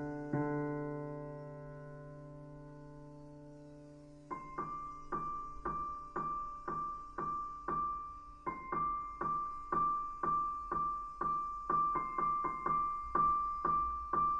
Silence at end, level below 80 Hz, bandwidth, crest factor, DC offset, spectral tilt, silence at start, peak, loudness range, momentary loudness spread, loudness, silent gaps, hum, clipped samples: 0 s; -58 dBFS; 7.8 kHz; 18 dB; under 0.1%; -8.5 dB/octave; 0 s; -20 dBFS; 14 LU; 19 LU; -37 LUFS; none; none; under 0.1%